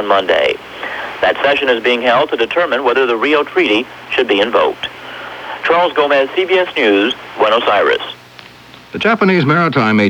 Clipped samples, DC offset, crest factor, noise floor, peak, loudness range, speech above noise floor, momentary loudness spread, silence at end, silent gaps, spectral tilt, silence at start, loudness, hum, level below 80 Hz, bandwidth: under 0.1%; under 0.1%; 14 dB; -38 dBFS; 0 dBFS; 1 LU; 25 dB; 12 LU; 0 s; none; -6 dB/octave; 0 s; -13 LUFS; none; -54 dBFS; 19 kHz